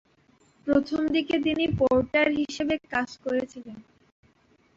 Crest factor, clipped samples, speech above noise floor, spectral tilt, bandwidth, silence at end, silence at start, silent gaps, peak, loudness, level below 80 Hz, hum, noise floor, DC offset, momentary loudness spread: 16 dB; under 0.1%; 38 dB; -6 dB/octave; 7.8 kHz; 0.95 s; 0.65 s; none; -10 dBFS; -25 LUFS; -52 dBFS; none; -63 dBFS; under 0.1%; 13 LU